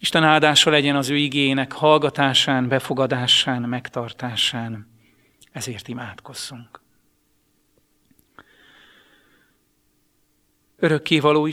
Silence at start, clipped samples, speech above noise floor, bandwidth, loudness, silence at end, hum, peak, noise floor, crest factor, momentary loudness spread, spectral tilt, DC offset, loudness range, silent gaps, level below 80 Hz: 0 s; under 0.1%; 45 dB; 15.5 kHz; -19 LUFS; 0 s; none; 0 dBFS; -65 dBFS; 22 dB; 18 LU; -4 dB/octave; under 0.1%; 20 LU; none; -62 dBFS